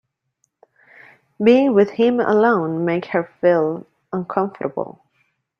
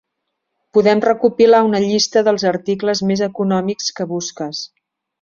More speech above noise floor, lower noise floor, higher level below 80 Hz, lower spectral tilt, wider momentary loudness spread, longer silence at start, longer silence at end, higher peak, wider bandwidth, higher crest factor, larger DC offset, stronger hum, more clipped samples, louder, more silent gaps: second, 53 dB vs 60 dB; second, -70 dBFS vs -75 dBFS; second, -66 dBFS vs -58 dBFS; first, -8 dB/octave vs -4.5 dB/octave; about the same, 14 LU vs 12 LU; first, 1.4 s vs 0.75 s; first, 0.7 s vs 0.55 s; about the same, -2 dBFS vs -2 dBFS; second, 6.8 kHz vs 7.6 kHz; about the same, 18 dB vs 16 dB; neither; neither; neither; about the same, -18 LUFS vs -16 LUFS; neither